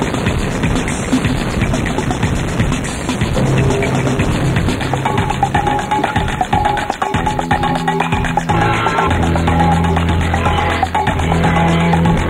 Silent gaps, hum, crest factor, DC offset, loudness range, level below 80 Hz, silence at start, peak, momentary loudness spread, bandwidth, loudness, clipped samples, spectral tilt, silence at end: none; none; 14 dB; under 0.1%; 2 LU; -26 dBFS; 0 s; 0 dBFS; 4 LU; 16 kHz; -15 LUFS; under 0.1%; -6 dB/octave; 0 s